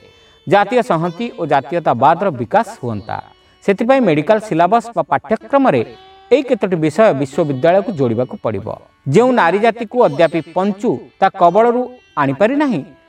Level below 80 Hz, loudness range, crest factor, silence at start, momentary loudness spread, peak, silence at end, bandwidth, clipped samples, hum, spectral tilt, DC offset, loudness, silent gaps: -56 dBFS; 2 LU; 14 dB; 0.45 s; 10 LU; 0 dBFS; 0.25 s; 10.5 kHz; under 0.1%; none; -7 dB/octave; under 0.1%; -15 LUFS; none